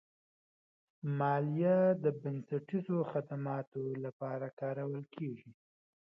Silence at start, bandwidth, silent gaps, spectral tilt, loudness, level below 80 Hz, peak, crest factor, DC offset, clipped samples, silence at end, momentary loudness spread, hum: 1.05 s; 5.4 kHz; 3.67-3.72 s, 4.13-4.20 s, 4.53-4.57 s; -9 dB/octave; -36 LUFS; -84 dBFS; -20 dBFS; 16 dB; under 0.1%; under 0.1%; 0.6 s; 12 LU; none